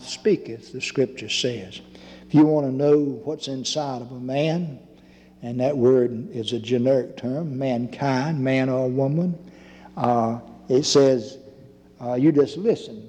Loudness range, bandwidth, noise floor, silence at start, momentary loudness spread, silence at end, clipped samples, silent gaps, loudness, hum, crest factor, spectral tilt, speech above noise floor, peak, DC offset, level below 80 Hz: 2 LU; 10 kHz; -50 dBFS; 0 s; 15 LU; 0 s; under 0.1%; none; -22 LUFS; none; 16 dB; -6 dB/octave; 28 dB; -6 dBFS; under 0.1%; -62 dBFS